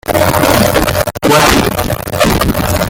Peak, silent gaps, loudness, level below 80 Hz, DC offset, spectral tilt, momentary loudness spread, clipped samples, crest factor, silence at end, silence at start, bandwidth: 0 dBFS; none; -11 LUFS; -24 dBFS; under 0.1%; -4.5 dB/octave; 6 LU; under 0.1%; 10 dB; 0 s; 0.05 s; 19.5 kHz